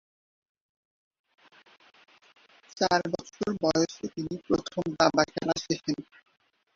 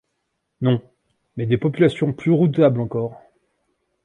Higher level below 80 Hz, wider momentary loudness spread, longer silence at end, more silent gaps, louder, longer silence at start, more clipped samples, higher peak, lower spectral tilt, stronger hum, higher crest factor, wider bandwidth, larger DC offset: second, -62 dBFS vs -56 dBFS; about the same, 11 LU vs 11 LU; about the same, 0.75 s vs 0.85 s; neither; second, -28 LUFS vs -20 LUFS; first, 2.75 s vs 0.6 s; neither; about the same, -6 dBFS vs -4 dBFS; second, -4.5 dB/octave vs -9 dB/octave; neither; first, 24 dB vs 18 dB; second, 7.6 kHz vs 9.8 kHz; neither